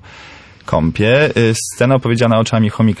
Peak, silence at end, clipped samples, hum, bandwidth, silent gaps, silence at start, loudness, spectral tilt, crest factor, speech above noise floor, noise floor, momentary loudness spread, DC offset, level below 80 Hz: -2 dBFS; 0 s; under 0.1%; none; 11 kHz; none; 0.15 s; -14 LUFS; -6 dB/octave; 12 dB; 26 dB; -39 dBFS; 5 LU; under 0.1%; -38 dBFS